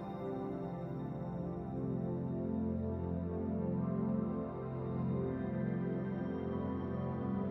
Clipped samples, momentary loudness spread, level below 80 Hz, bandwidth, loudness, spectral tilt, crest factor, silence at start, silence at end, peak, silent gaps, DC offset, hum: under 0.1%; 5 LU; -58 dBFS; 4 kHz; -39 LUFS; -11.5 dB/octave; 12 dB; 0 s; 0 s; -26 dBFS; none; under 0.1%; none